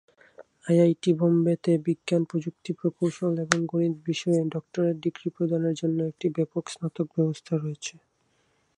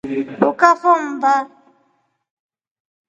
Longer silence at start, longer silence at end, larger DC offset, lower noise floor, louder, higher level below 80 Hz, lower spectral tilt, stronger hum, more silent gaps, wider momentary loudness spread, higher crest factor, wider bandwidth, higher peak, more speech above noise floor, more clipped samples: first, 0.4 s vs 0.05 s; second, 0.85 s vs 1.65 s; neither; first, -69 dBFS vs -65 dBFS; second, -26 LUFS vs -16 LUFS; second, -72 dBFS vs -66 dBFS; first, -6.5 dB/octave vs -5 dB/octave; neither; neither; about the same, 9 LU vs 10 LU; first, 24 dB vs 18 dB; first, 11 kHz vs 8 kHz; about the same, -2 dBFS vs 0 dBFS; second, 44 dB vs 49 dB; neither